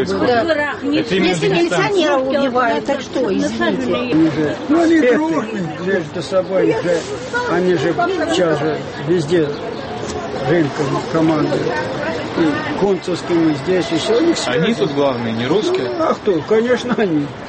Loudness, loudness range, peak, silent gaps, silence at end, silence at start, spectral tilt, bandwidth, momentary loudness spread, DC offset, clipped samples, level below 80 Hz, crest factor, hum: -17 LUFS; 2 LU; -4 dBFS; none; 0 s; 0 s; -5.5 dB/octave; 8.8 kHz; 6 LU; under 0.1%; under 0.1%; -48 dBFS; 12 dB; none